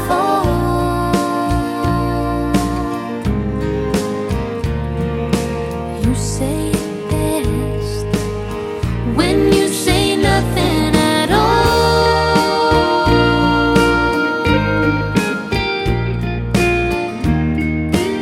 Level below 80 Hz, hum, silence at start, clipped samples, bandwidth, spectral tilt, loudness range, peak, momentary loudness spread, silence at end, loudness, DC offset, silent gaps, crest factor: -26 dBFS; none; 0 s; under 0.1%; 16.5 kHz; -5.5 dB/octave; 6 LU; 0 dBFS; 8 LU; 0 s; -16 LUFS; under 0.1%; none; 16 dB